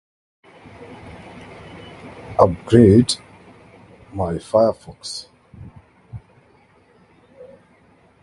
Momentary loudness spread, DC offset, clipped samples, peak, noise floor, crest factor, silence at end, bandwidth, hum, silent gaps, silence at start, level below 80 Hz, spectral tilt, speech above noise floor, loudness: 28 LU; under 0.1%; under 0.1%; 0 dBFS; -54 dBFS; 22 dB; 2.05 s; 11.5 kHz; none; none; 0.9 s; -44 dBFS; -6.5 dB/octave; 38 dB; -17 LUFS